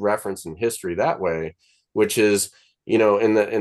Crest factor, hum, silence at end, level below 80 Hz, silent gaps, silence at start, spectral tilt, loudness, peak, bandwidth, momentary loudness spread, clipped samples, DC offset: 16 dB; none; 0 s; -58 dBFS; none; 0 s; -4 dB/octave; -21 LUFS; -6 dBFS; 12.5 kHz; 11 LU; under 0.1%; under 0.1%